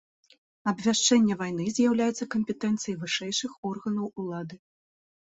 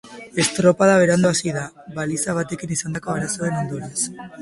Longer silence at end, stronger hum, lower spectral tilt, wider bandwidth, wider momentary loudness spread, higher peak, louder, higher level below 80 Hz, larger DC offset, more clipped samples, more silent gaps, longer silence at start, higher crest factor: first, 0.75 s vs 0 s; neither; about the same, -3.5 dB/octave vs -4.5 dB/octave; second, 8.2 kHz vs 11.5 kHz; about the same, 12 LU vs 11 LU; second, -10 dBFS vs -2 dBFS; second, -27 LUFS vs -20 LUFS; second, -68 dBFS vs -54 dBFS; neither; neither; first, 3.58-3.63 s vs none; first, 0.65 s vs 0.05 s; about the same, 18 dB vs 18 dB